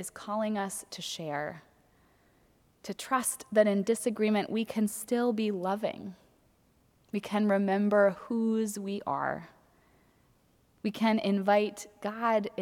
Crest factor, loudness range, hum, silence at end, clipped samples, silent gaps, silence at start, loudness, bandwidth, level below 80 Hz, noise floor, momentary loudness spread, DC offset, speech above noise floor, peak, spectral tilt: 20 dB; 4 LU; none; 0 s; under 0.1%; none; 0 s; -30 LUFS; 16.5 kHz; -72 dBFS; -67 dBFS; 12 LU; under 0.1%; 37 dB; -12 dBFS; -5 dB/octave